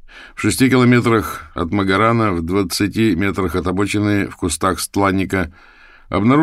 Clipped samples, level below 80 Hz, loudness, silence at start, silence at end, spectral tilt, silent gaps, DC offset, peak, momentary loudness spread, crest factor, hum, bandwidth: under 0.1%; -40 dBFS; -17 LUFS; 0.05 s; 0 s; -5.5 dB/octave; none; 0.1%; -2 dBFS; 9 LU; 16 dB; none; 16 kHz